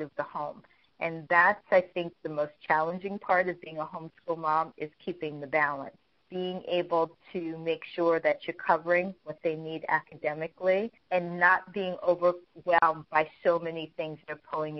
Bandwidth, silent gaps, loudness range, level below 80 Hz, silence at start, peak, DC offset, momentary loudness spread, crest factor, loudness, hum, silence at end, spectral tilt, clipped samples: 6 kHz; none; 4 LU; -72 dBFS; 0 s; -8 dBFS; under 0.1%; 13 LU; 22 dB; -29 LUFS; none; 0 s; -3 dB/octave; under 0.1%